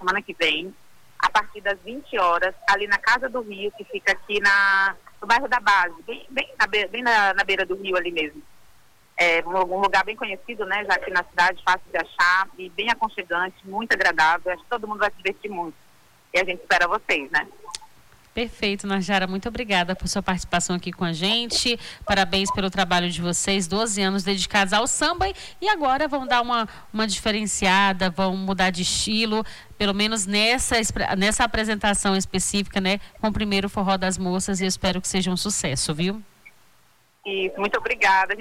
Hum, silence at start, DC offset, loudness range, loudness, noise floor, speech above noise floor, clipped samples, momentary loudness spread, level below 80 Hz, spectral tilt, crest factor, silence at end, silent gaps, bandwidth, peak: none; 0 s; under 0.1%; 4 LU; -22 LUFS; -60 dBFS; 37 dB; under 0.1%; 10 LU; -46 dBFS; -3 dB/octave; 16 dB; 0 s; none; 16.5 kHz; -8 dBFS